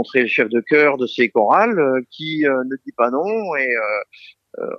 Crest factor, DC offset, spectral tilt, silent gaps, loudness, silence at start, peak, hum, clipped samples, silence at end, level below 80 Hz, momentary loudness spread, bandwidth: 16 dB; under 0.1%; -6.5 dB/octave; none; -18 LUFS; 0 s; -2 dBFS; none; under 0.1%; 0 s; -74 dBFS; 11 LU; 6.6 kHz